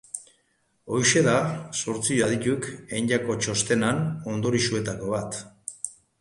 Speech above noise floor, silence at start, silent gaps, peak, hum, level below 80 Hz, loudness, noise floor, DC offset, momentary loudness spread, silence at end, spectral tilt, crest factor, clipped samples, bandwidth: 44 dB; 0.15 s; none; -6 dBFS; none; -58 dBFS; -25 LUFS; -69 dBFS; under 0.1%; 14 LU; 0.3 s; -4 dB/octave; 20 dB; under 0.1%; 11.5 kHz